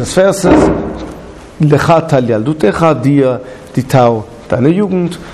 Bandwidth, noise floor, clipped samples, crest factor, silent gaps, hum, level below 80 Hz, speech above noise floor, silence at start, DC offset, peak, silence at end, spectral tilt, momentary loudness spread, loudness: 13.5 kHz; -30 dBFS; under 0.1%; 10 dB; none; none; -34 dBFS; 20 dB; 0 s; under 0.1%; 0 dBFS; 0 s; -7 dB/octave; 12 LU; -11 LUFS